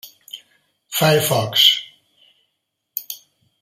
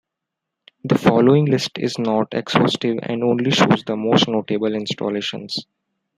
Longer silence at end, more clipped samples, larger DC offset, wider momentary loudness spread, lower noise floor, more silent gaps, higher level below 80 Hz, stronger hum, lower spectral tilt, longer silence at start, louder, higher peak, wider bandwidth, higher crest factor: about the same, 0.45 s vs 0.55 s; neither; neither; first, 24 LU vs 10 LU; second, -75 dBFS vs -82 dBFS; neither; about the same, -60 dBFS vs -60 dBFS; neither; second, -3 dB/octave vs -6 dB/octave; second, 0.05 s vs 0.85 s; first, -16 LUFS vs -19 LUFS; about the same, 0 dBFS vs -2 dBFS; first, 16 kHz vs 13 kHz; about the same, 22 dB vs 18 dB